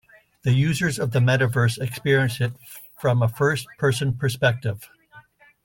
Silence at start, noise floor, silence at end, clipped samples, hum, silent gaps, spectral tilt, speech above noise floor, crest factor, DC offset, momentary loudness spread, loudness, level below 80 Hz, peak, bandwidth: 0.45 s; -51 dBFS; 0.45 s; under 0.1%; none; none; -6 dB/octave; 30 dB; 16 dB; under 0.1%; 9 LU; -22 LUFS; -54 dBFS; -6 dBFS; 17 kHz